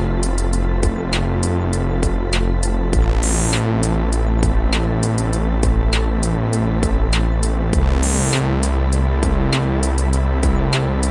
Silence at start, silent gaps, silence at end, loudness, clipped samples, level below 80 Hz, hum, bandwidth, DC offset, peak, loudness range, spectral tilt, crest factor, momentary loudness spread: 0 s; none; 0 s; -19 LUFS; under 0.1%; -18 dBFS; none; 11.5 kHz; under 0.1%; -2 dBFS; 1 LU; -5.5 dB/octave; 14 dB; 3 LU